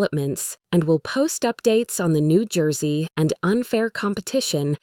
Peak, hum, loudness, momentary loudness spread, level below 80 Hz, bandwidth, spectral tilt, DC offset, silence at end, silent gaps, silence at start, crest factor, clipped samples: -6 dBFS; none; -22 LUFS; 5 LU; -58 dBFS; 18.5 kHz; -5.5 dB/octave; under 0.1%; 0.05 s; none; 0 s; 14 dB; under 0.1%